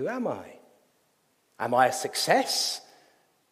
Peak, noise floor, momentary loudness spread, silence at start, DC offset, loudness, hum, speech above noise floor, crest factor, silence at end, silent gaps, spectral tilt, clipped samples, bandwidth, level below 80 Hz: -6 dBFS; -69 dBFS; 12 LU; 0 s; under 0.1%; -26 LUFS; none; 43 dB; 24 dB; 0.7 s; none; -2 dB/octave; under 0.1%; 15.5 kHz; -80 dBFS